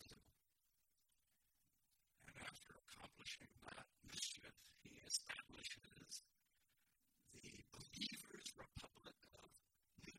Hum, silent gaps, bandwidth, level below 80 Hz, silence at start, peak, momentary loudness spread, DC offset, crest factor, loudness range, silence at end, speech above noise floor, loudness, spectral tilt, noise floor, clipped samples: none; none; 16.5 kHz; -78 dBFS; 0 s; -28 dBFS; 18 LU; under 0.1%; 30 dB; 9 LU; 0 s; 30 dB; -54 LUFS; -1 dB/octave; -87 dBFS; under 0.1%